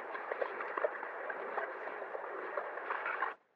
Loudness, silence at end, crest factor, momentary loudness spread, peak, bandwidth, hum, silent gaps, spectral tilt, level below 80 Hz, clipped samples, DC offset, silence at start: -40 LUFS; 0.2 s; 20 dB; 5 LU; -20 dBFS; 6.8 kHz; none; none; -4.5 dB/octave; under -90 dBFS; under 0.1%; under 0.1%; 0 s